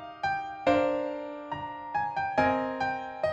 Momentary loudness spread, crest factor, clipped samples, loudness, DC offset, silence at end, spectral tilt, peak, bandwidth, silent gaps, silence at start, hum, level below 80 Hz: 11 LU; 18 dB; under 0.1%; -30 LUFS; under 0.1%; 0 s; -6 dB/octave; -12 dBFS; 8.6 kHz; none; 0 s; none; -60 dBFS